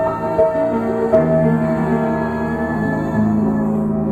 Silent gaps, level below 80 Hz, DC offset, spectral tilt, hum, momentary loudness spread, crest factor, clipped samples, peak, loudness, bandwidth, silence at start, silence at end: none; -40 dBFS; under 0.1%; -9.5 dB/octave; none; 5 LU; 16 dB; under 0.1%; -2 dBFS; -17 LUFS; 8.4 kHz; 0 s; 0 s